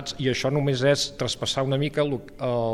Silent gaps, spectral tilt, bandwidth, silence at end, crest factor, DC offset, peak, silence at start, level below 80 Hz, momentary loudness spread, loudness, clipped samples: none; -5 dB/octave; 13.5 kHz; 0 s; 16 dB; under 0.1%; -8 dBFS; 0 s; -50 dBFS; 6 LU; -25 LUFS; under 0.1%